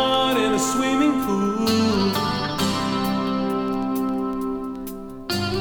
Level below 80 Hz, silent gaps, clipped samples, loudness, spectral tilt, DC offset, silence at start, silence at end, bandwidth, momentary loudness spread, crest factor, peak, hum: -46 dBFS; none; under 0.1%; -22 LUFS; -4.5 dB/octave; under 0.1%; 0 s; 0 s; over 20 kHz; 8 LU; 14 dB; -8 dBFS; 50 Hz at -45 dBFS